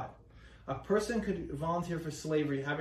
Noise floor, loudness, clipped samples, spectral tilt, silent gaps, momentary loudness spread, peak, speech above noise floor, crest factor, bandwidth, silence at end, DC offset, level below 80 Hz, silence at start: -56 dBFS; -35 LUFS; under 0.1%; -6 dB/octave; none; 10 LU; -18 dBFS; 22 dB; 16 dB; 15 kHz; 0 s; under 0.1%; -56 dBFS; 0 s